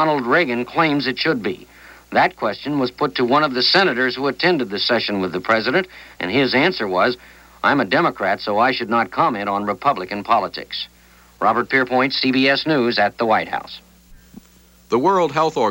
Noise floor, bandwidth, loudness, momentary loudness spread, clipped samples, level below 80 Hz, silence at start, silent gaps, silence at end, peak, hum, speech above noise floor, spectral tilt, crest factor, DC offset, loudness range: -50 dBFS; 16.5 kHz; -18 LUFS; 9 LU; under 0.1%; -54 dBFS; 0 s; none; 0 s; -2 dBFS; 60 Hz at -55 dBFS; 32 dB; -5.5 dB/octave; 18 dB; under 0.1%; 2 LU